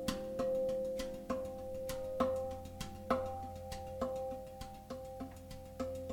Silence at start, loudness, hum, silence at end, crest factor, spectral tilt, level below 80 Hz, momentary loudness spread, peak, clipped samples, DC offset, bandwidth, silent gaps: 0 s; -41 LUFS; none; 0 s; 22 dB; -5.5 dB/octave; -56 dBFS; 12 LU; -18 dBFS; under 0.1%; under 0.1%; 18 kHz; none